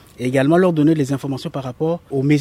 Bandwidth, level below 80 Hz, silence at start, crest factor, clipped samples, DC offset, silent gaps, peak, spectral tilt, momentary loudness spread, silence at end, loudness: 15 kHz; -54 dBFS; 0.2 s; 14 dB; under 0.1%; under 0.1%; none; -2 dBFS; -7.5 dB/octave; 11 LU; 0 s; -18 LUFS